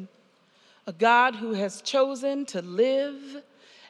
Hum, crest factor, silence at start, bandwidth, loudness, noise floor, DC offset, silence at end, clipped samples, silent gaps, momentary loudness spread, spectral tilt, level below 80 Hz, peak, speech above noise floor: none; 20 dB; 0 s; 11.5 kHz; -25 LUFS; -62 dBFS; under 0.1%; 0.5 s; under 0.1%; none; 22 LU; -4 dB/octave; under -90 dBFS; -6 dBFS; 36 dB